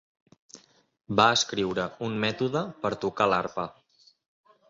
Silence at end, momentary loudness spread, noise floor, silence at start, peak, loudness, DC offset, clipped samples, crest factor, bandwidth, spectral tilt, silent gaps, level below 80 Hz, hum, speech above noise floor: 1 s; 11 LU; -54 dBFS; 0.55 s; -4 dBFS; -26 LUFS; under 0.1%; under 0.1%; 24 dB; 7.8 kHz; -4 dB/octave; none; -62 dBFS; none; 28 dB